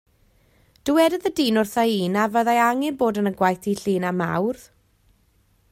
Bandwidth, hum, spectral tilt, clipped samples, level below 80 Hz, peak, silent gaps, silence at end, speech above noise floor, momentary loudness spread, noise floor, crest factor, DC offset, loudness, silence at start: 16 kHz; none; -5.5 dB/octave; under 0.1%; -60 dBFS; -4 dBFS; none; 1.1 s; 41 dB; 6 LU; -62 dBFS; 18 dB; under 0.1%; -21 LUFS; 0.85 s